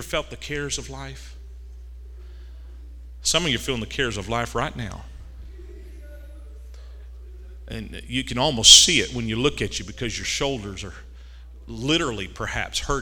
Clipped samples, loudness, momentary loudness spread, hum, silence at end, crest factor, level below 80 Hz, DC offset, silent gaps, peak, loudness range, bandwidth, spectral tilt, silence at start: under 0.1%; -20 LUFS; 23 LU; none; 0 s; 26 dB; -38 dBFS; under 0.1%; none; 0 dBFS; 17 LU; 18 kHz; -2 dB/octave; 0 s